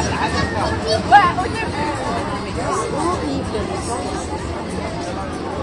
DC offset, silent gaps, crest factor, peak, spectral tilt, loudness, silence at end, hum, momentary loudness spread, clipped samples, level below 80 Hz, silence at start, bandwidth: under 0.1%; none; 20 dB; 0 dBFS; -5 dB/octave; -20 LUFS; 0 s; none; 13 LU; under 0.1%; -36 dBFS; 0 s; 11.5 kHz